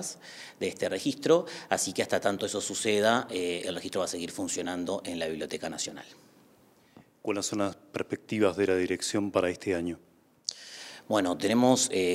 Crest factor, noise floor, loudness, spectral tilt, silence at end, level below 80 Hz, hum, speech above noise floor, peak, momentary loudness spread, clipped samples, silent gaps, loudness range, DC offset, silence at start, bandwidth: 20 dB; -61 dBFS; -29 LUFS; -3.5 dB/octave; 0 s; -72 dBFS; none; 32 dB; -10 dBFS; 12 LU; under 0.1%; none; 7 LU; under 0.1%; 0 s; 16 kHz